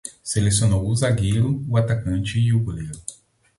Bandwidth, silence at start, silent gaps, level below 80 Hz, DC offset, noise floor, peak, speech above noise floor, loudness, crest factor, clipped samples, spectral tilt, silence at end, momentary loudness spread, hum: 11.5 kHz; 0.05 s; none; -40 dBFS; under 0.1%; -41 dBFS; -6 dBFS; 21 dB; -21 LUFS; 14 dB; under 0.1%; -5.5 dB/octave; 0.45 s; 12 LU; none